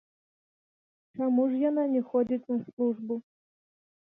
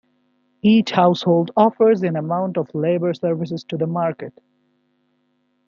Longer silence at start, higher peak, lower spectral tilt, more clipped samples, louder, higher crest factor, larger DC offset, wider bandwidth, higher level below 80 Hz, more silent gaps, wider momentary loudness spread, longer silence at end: first, 1.15 s vs 0.65 s; second, -16 dBFS vs -2 dBFS; first, -10.5 dB/octave vs -8 dB/octave; neither; second, -29 LUFS vs -19 LUFS; about the same, 14 dB vs 18 dB; neither; second, 3.5 kHz vs 7.2 kHz; second, -76 dBFS vs -66 dBFS; first, 2.73-2.77 s vs none; about the same, 10 LU vs 10 LU; second, 0.95 s vs 1.4 s